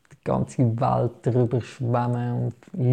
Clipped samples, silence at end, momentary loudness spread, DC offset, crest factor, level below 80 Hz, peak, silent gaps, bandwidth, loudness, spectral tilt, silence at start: under 0.1%; 0 s; 5 LU; under 0.1%; 14 dB; -54 dBFS; -10 dBFS; none; 9.2 kHz; -25 LUFS; -9 dB/octave; 0.25 s